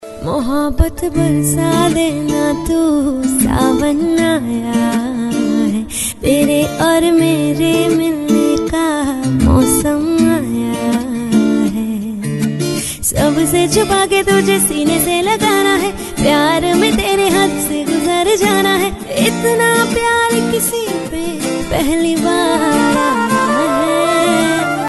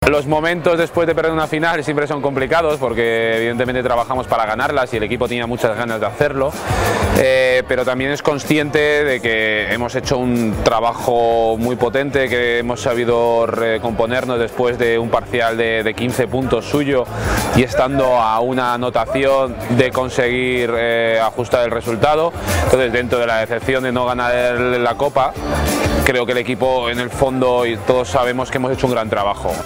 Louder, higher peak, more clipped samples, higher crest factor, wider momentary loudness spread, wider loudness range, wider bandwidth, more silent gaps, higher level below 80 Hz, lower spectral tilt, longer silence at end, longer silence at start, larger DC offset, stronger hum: first, -14 LUFS vs -17 LUFS; about the same, 0 dBFS vs 0 dBFS; neither; about the same, 14 dB vs 16 dB; about the same, 6 LU vs 4 LU; about the same, 2 LU vs 1 LU; second, 12.5 kHz vs 16.5 kHz; neither; about the same, -32 dBFS vs -34 dBFS; about the same, -4.5 dB/octave vs -5 dB/octave; about the same, 0 s vs 0 s; about the same, 0 s vs 0 s; neither; neither